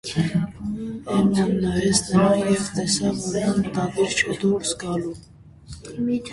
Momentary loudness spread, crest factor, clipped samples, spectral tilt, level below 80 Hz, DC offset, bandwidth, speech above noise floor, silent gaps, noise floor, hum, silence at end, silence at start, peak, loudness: 12 LU; 18 dB; under 0.1%; -5 dB/octave; -48 dBFS; under 0.1%; 11.5 kHz; 20 dB; none; -42 dBFS; none; 0 s; 0.05 s; -4 dBFS; -22 LUFS